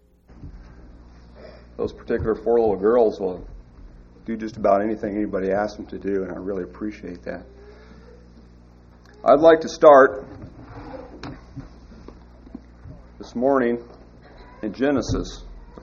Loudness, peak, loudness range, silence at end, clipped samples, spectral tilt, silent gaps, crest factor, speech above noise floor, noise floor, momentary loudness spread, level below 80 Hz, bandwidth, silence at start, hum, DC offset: -20 LUFS; 0 dBFS; 12 LU; 0 s; under 0.1%; -5 dB/octave; none; 22 dB; 29 dB; -48 dBFS; 27 LU; -44 dBFS; 7.2 kHz; 0.4 s; 60 Hz at -50 dBFS; under 0.1%